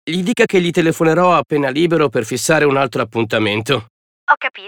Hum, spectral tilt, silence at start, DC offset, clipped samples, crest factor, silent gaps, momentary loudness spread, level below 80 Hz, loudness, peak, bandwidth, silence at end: none; -5 dB/octave; 0.05 s; under 0.1%; under 0.1%; 16 dB; 3.90-4.27 s; 6 LU; -58 dBFS; -15 LUFS; 0 dBFS; 19 kHz; 0 s